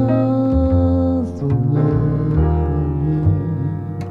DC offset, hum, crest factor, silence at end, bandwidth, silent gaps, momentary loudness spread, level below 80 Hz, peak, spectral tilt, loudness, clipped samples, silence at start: under 0.1%; none; 12 dB; 0 s; 4.8 kHz; none; 5 LU; -26 dBFS; -4 dBFS; -11.5 dB/octave; -18 LUFS; under 0.1%; 0 s